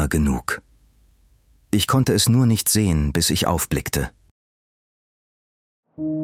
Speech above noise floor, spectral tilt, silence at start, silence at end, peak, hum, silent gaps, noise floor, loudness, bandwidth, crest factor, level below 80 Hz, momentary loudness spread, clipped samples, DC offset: 37 dB; -4.5 dB/octave; 0 s; 0 s; -4 dBFS; none; 4.31-5.83 s; -57 dBFS; -20 LUFS; 19.5 kHz; 18 dB; -36 dBFS; 11 LU; under 0.1%; under 0.1%